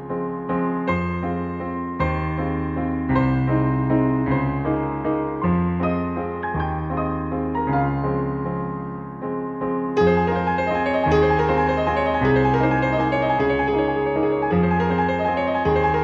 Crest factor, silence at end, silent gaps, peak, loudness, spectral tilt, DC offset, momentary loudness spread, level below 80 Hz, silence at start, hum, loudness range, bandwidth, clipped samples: 16 dB; 0 s; none; -6 dBFS; -22 LUFS; -9 dB/octave; under 0.1%; 8 LU; -38 dBFS; 0 s; none; 5 LU; 7.4 kHz; under 0.1%